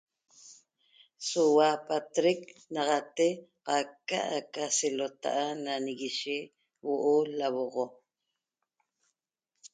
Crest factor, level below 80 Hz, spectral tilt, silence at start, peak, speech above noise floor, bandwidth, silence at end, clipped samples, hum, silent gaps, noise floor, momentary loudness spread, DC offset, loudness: 20 dB; -84 dBFS; -3 dB/octave; 0.45 s; -12 dBFS; 56 dB; 9.4 kHz; 0.05 s; under 0.1%; none; none; -86 dBFS; 11 LU; under 0.1%; -30 LUFS